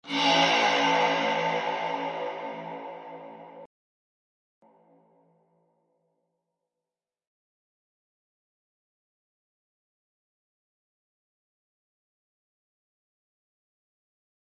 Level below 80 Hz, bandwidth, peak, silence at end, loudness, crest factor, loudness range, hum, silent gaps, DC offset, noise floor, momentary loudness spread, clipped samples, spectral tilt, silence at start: -82 dBFS; 10 kHz; -10 dBFS; 10.75 s; -25 LUFS; 22 dB; 22 LU; none; none; under 0.1%; under -90 dBFS; 22 LU; under 0.1%; -3 dB/octave; 0.05 s